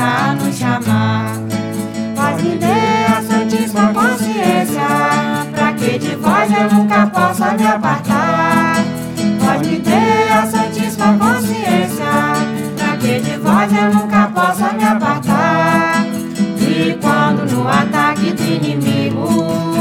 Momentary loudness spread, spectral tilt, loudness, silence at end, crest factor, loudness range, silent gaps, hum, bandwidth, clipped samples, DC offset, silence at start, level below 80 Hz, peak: 5 LU; -5.5 dB/octave; -14 LUFS; 0 s; 14 dB; 2 LU; none; none; 16.5 kHz; under 0.1%; under 0.1%; 0 s; -50 dBFS; 0 dBFS